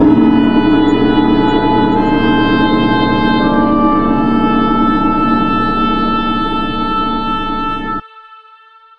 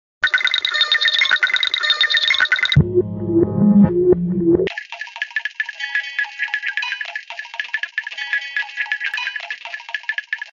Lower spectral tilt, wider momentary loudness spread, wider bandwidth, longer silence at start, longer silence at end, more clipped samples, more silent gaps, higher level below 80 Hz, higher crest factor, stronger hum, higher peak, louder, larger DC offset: first, -8 dB/octave vs -5 dB/octave; second, 6 LU vs 13 LU; second, 5.6 kHz vs 7.4 kHz; second, 0 s vs 0.2 s; first, 0.65 s vs 0 s; neither; neither; first, -26 dBFS vs -44 dBFS; second, 12 dB vs 18 dB; neither; about the same, 0 dBFS vs 0 dBFS; first, -12 LUFS vs -18 LUFS; neither